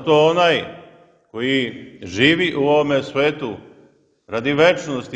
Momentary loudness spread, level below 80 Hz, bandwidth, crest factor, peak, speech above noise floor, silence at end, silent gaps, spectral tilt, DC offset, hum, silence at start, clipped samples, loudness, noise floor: 15 LU; -56 dBFS; 8.6 kHz; 18 dB; 0 dBFS; 36 dB; 0 s; none; -5 dB/octave; under 0.1%; none; 0 s; under 0.1%; -18 LUFS; -54 dBFS